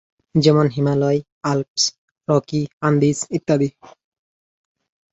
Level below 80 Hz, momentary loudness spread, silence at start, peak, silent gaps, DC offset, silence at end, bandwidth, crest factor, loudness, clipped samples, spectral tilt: -58 dBFS; 8 LU; 0.35 s; -2 dBFS; 1.32-1.41 s, 1.68-1.75 s, 1.98-2.08 s, 2.73-2.81 s; under 0.1%; 1.4 s; 8.2 kHz; 18 dB; -19 LUFS; under 0.1%; -5.5 dB/octave